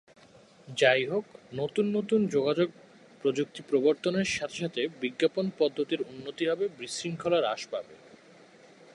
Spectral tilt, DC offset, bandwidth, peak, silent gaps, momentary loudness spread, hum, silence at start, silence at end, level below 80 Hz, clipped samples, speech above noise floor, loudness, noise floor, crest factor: -5 dB/octave; under 0.1%; 11.5 kHz; -10 dBFS; none; 9 LU; none; 0.65 s; 1 s; -70 dBFS; under 0.1%; 28 dB; -29 LUFS; -56 dBFS; 20 dB